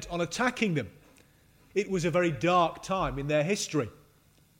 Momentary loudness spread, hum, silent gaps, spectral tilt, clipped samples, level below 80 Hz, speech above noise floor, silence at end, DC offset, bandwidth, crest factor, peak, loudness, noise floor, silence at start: 9 LU; none; none; -5 dB/octave; under 0.1%; -52 dBFS; 34 dB; 0.65 s; under 0.1%; 16 kHz; 18 dB; -12 dBFS; -29 LUFS; -62 dBFS; 0 s